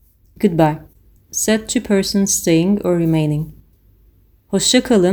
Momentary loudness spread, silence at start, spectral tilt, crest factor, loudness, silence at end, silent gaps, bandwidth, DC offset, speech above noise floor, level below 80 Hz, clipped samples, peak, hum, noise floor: 9 LU; 0.4 s; -4.5 dB/octave; 16 dB; -16 LUFS; 0 s; none; over 20 kHz; under 0.1%; 37 dB; -44 dBFS; under 0.1%; 0 dBFS; none; -52 dBFS